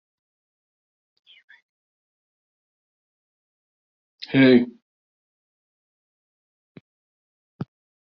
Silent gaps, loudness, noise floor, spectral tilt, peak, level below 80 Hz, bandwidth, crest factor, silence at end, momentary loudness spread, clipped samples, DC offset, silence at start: 4.82-6.75 s, 6.81-7.59 s; -18 LUFS; under -90 dBFS; -5 dB/octave; -4 dBFS; -70 dBFS; 5.6 kHz; 24 dB; 0.4 s; 23 LU; under 0.1%; under 0.1%; 4.3 s